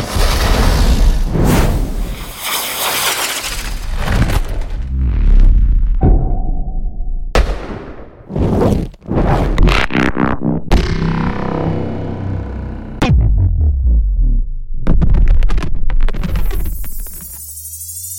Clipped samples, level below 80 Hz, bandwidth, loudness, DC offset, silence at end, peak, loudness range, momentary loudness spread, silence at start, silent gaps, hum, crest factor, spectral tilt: under 0.1%; -14 dBFS; 17 kHz; -17 LUFS; under 0.1%; 0 s; -2 dBFS; 3 LU; 12 LU; 0 s; none; none; 12 dB; -5 dB/octave